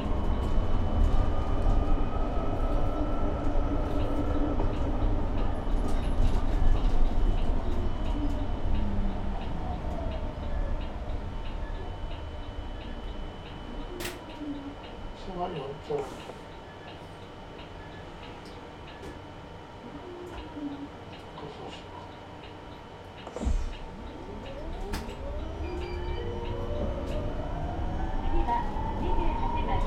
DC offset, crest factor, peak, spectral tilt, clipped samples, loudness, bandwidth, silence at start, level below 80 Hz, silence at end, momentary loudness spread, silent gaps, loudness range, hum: under 0.1%; 18 dB; -10 dBFS; -7 dB/octave; under 0.1%; -34 LUFS; 8.6 kHz; 0 s; -30 dBFS; 0 s; 13 LU; none; 11 LU; none